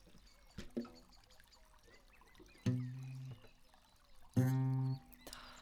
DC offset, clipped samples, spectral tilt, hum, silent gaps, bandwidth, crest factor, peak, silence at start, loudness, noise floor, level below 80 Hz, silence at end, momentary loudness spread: under 0.1%; under 0.1%; -7.5 dB/octave; none; none; 16 kHz; 22 dB; -20 dBFS; 0.1 s; -41 LUFS; -66 dBFS; -64 dBFS; 0 s; 22 LU